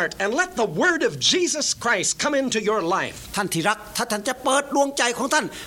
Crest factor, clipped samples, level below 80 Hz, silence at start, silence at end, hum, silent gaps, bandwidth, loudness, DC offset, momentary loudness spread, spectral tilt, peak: 18 dB; under 0.1%; -54 dBFS; 0 s; 0 s; none; none; 17 kHz; -22 LUFS; under 0.1%; 6 LU; -2 dB/octave; -4 dBFS